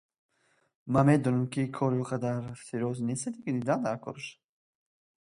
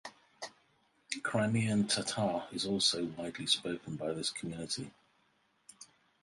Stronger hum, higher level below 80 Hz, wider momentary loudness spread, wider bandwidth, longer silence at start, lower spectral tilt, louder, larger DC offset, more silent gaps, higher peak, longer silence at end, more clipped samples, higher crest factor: neither; about the same, -64 dBFS vs -68 dBFS; second, 15 LU vs 18 LU; about the same, 11.5 kHz vs 11.5 kHz; first, 0.85 s vs 0.05 s; first, -7 dB/octave vs -4 dB/octave; first, -30 LUFS vs -34 LUFS; neither; neither; first, -10 dBFS vs -14 dBFS; first, 0.9 s vs 0.35 s; neither; about the same, 20 dB vs 22 dB